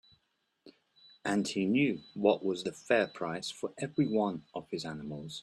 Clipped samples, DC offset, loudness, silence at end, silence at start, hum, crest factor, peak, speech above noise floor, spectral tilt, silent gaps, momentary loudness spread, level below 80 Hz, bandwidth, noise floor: under 0.1%; under 0.1%; -33 LUFS; 0 s; 0.65 s; none; 22 dB; -12 dBFS; 46 dB; -5.5 dB/octave; none; 11 LU; -72 dBFS; 12.5 kHz; -78 dBFS